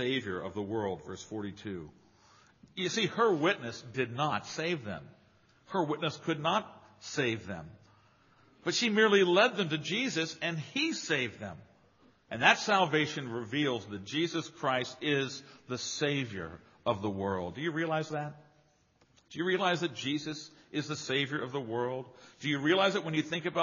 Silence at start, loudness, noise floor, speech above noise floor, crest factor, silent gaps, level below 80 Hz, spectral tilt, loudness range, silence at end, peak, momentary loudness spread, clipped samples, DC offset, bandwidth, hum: 0 s; -32 LUFS; -68 dBFS; 36 dB; 26 dB; none; -72 dBFS; -3 dB/octave; 6 LU; 0 s; -8 dBFS; 16 LU; under 0.1%; under 0.1%; 7.2 kHz; none